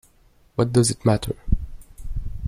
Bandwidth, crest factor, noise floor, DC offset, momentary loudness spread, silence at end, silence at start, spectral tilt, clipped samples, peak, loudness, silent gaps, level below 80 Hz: 15.5 kHz; 18 dB; -56 dBFS; under 0.1%; 18 LU; 0 s; 0.6 s; -6 dB/octave; under 0.1%; -6 dBFS; -22 LUFS; none; -30 dBFS